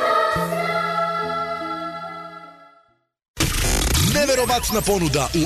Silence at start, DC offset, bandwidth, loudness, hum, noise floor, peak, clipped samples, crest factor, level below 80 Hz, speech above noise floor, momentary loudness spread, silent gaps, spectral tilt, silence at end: 0 s; under 0.1%; 14 kHz; -20 LUFS; none; -60 dBFS; -6 dBFS; under 0.1%; 14 dB; -32 dBFS; 40 dB; 14 LU; 3.28-3.34 s; -3.5 dB/octave; 0 s